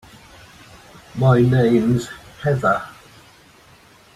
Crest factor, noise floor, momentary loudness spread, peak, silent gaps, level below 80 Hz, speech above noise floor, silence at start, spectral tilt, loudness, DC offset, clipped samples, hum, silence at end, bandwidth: 18 dB; -49 dBFS; 20 LU; -2 dBFS; none; -50 dBFS; 33 dB; 1.15 s; -8 dB/octave; -18 LUFS; under 0.1%; under 0.1%; none; 1.25 s; 12 kHz